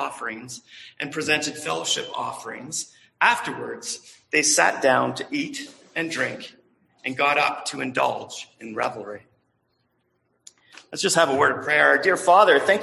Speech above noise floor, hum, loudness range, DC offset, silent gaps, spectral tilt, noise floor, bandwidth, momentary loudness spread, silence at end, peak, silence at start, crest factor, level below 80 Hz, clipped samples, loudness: 47 dB; none; 5 LU; under 0.1%; none; -2 dB/octave; -70 dBFS; 12.5 kHz; 19 LU; 0 s; -4 dBFS; 0 s; 20 dB; -70 dBFS; under 0.1%; -22 LUFS